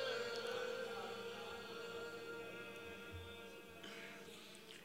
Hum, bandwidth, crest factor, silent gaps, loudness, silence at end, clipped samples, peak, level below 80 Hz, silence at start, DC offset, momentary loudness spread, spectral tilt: none; 16 kHz; 18 dB; none; -49 LUFS; 0 s; under 0.1%; -32 dBFS; -78 dBFS; 0 s; under 0.1%; 11 LU; -3.5 dB/octave